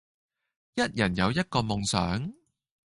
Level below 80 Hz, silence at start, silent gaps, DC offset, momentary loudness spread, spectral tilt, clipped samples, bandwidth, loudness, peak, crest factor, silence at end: -50 dBFS; 0.75 s; none; under 0.1%; 8 LU; -4.5 dB/octave; under 0.1%; 11.5 kHz; -28 LUFS; -8 dBFS; 22 dB; 0.55 s